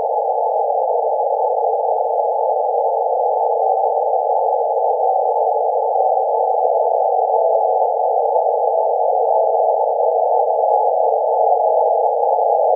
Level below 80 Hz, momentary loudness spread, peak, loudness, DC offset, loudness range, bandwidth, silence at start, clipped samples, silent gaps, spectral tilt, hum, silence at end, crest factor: under -90 dBFS; 2 LU; -4 dBFS; -17 LUFS; under 0.1%; 2 LU; 1 kHz; 0 s; under 0.1%; none; -8 dB/octave; none; 0 s; 12 dB